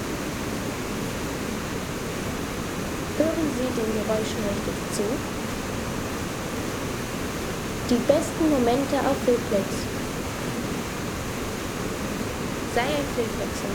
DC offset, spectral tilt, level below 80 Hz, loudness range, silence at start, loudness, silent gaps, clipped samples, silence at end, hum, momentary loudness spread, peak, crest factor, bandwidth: under 0.1%; -4.5 dB/octave; -42 dBFS; 5 LU; 0 s; -27 LUFS; none; under 0.1%; 0 s; none; 7 LU; -6 dBFS; 20 dB; over 20 kHz